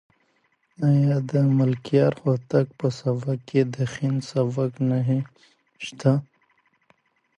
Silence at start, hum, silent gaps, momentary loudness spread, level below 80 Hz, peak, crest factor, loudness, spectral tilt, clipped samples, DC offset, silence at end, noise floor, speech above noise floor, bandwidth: 0.8 s; none; none; 6 LU; -64 dBFS; -6 dBFS; 18 dB; -23 LUFS; -8 dB/octave; under 0.1%; under 0.1%; 1.15 s; -67 dBFS; 45 dB; 9 kHz